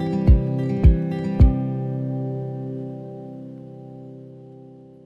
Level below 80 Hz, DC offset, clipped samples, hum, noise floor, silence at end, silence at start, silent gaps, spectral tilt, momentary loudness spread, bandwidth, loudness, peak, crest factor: -24 dBFS; under 0.1%; under 0.1%; none; -44 dBFS; 0.25 s; 0 s; none; -10.5 dB/octave; 22 LU; 5 kHz; -21 LUFS; -4 dBFS; 18 dB